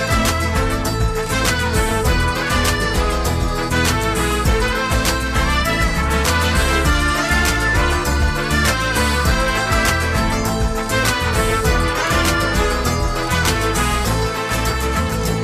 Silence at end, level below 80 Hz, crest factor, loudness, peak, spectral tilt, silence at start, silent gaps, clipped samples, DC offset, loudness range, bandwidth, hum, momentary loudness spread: 0 s; -22 dBFS; 14 dB; -17 LUFS; -2 dBFS; -4 dB/octave; 0 s; none; under 0.1%; under 0.1%; 1 LU; 15 kHz; none; 3 LU